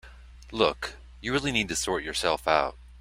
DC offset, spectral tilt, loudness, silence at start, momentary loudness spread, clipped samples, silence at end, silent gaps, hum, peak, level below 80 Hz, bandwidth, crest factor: under 0.1%; -3 dB/octave; -27 LUFS; 0.05 s; 12 LU; under 0.1%; 0 s; none; none; -6 dBFS; -48 dBFS; 16 kHz; 24 dB